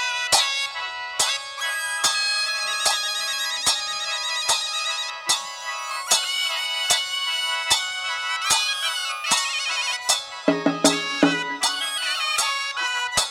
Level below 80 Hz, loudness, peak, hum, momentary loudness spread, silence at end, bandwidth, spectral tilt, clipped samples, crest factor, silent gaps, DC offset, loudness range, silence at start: -62 dBFS; -22 LUFS; -4 dBFS; none; 6 LU; 0 s; 17 kHz; -0.5 dB/octave; under 0.1%; 20 dB; none; under 0.1%; 1 LU; 0 s